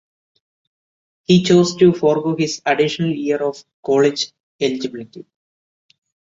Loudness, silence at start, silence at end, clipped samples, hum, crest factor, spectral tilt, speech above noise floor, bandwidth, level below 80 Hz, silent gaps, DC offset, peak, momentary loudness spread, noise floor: -17 LUFS; 1.3 s; 1.1 s; under 0.1%; none; 18 dB; -5.5 dB/octave; over 73 dB; 7.8 kHz; -58 dBFS; 3.74-3.83 s, 4.40-4.59 s; under 0.1%; -2 dBFS; 15 LU; under -90 dBFS